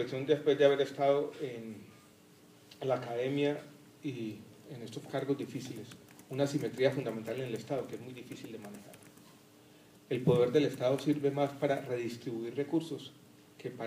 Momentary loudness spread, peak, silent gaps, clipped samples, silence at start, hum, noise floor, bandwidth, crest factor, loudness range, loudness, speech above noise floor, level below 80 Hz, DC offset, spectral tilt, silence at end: 19 LU; -12 dBFS; none; under 0.1%; 0 s; none; -60 dBFS; 15.5 kHz; 22 dB; 6 LU; -33 LUFS; 27 dB; -78 dBFS; under 0.1%; -6.5 dB/octave; 0 s